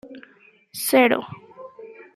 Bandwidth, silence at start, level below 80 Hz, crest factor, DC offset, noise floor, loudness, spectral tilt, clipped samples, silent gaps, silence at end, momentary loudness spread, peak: 15 kHz; 0.05 s; -72 dBFS; 20 dB; under 0.1%; -55 dBFS; -20 LUFS; -3 dB/octave; under 0.1%; none; 0.15 s; 26 LU; -4 dBFS